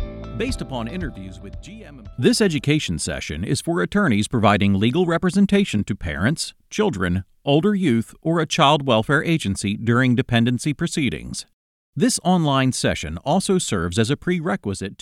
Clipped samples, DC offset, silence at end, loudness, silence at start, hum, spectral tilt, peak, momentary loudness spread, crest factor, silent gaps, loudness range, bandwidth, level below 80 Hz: under 0.1%; under 0.1%; 0.1 s; -20 LUFS; 0 s; none; -5 dB/octave; -2 dBFS; 12 LU; 18 dB; 11.53-11.93 s; 3 LU; 15 kHz; -42 dBFS